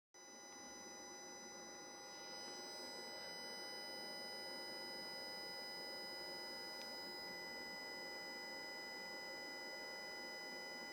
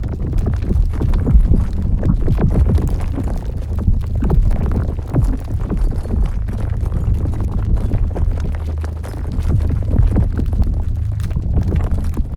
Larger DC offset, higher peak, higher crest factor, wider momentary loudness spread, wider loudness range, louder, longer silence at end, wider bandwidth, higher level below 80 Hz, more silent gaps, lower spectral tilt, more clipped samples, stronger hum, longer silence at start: neither; second, -36 dBFS vs 0 dBFS; about the same, 16 dB vs 16 dB; about the same, 5 LU vs 7 LU; about the same, 3 LU vs 3 LU; second, -49 LUFS vs -19 LUFS; about the same, 0 s vs 0 s; first, over 20 kHz vs 11 kHz; second, -86 dBFS vs -18 dBFS; neither; second, -1 dB/octave vs -9 dB/octave; neither; neither; first, 0.15 s vs 0 s